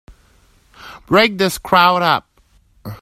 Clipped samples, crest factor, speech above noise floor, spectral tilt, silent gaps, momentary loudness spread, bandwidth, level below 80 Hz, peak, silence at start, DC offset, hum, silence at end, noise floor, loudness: under 0.1%; 18 dB; 40 dB; -4 dB/octave; none; 15 LU; 16 kHz; -48 dBFS; 0 dBFS; 0.1 s; under 0.1%; none; 0.05 s; -54 dBFS; -14 LUFS